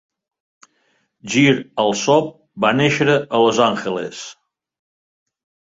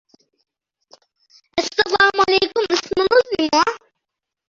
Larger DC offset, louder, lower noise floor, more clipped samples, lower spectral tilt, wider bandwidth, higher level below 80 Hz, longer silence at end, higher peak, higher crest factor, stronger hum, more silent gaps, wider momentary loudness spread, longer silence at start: neither; about the same, -17 LUFS vs -17 LUFS; second, -65 dBFS vs -82 dBFS; neither; first, -4.5 dB/octave vs -2.5 dB/octave; about the same, 8 kHz vs 7.8 kHz; about the same, -60 dBFS vs -56 dBFS; first, 1.35 s vs 0.75 s; about the same, -2 dBFS vs -2 dBFS; about the same, 18 dB vs 18 dB; neither; neither; first, 16 LU vs 8 LU; second, 1.25 s vs 1.55 s